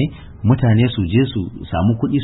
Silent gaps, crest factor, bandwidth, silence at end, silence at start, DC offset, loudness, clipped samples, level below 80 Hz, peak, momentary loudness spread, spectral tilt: none; 16 dB; 4.1 kHz; 0 s; 0 s; under 0.1%; -17 LUFS; under 0.1%; -36 dBFS; 0 dBFS; 9 LU; -13 dB/octave